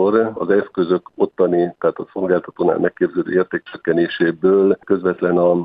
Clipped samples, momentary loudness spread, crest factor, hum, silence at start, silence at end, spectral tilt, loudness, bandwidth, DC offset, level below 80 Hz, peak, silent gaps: under 0.1%; 6 LU; 16 dB; none; 0 s; 0 s; -10.5 dB/octave; -18 LUFS; 4.8 kHz; under 0.1%; -60 dBFS; -2 dBFS; none